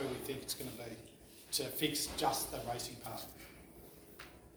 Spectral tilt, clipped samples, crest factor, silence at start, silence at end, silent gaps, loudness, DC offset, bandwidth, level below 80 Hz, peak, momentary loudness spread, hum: -3 dB/octave; under 0.1%; 22 dB; 0 s; 0 s; none; -39 LUFS; under 0.1%; over 20 kHz; -62 dBFS; -18 dBFS; 20 LU; none